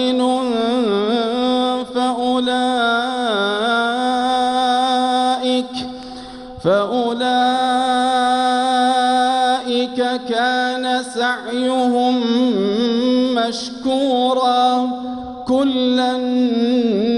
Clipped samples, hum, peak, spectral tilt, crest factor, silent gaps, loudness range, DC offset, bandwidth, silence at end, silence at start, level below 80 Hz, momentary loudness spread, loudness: under 0.1%; none; -4 dBFS; -4 dB/octave; 12 dB; none; 2 LU; under 0.1%; 11 kHz; 0 s; 0 s; -54 dBFS; 5 LU; -17 LUFS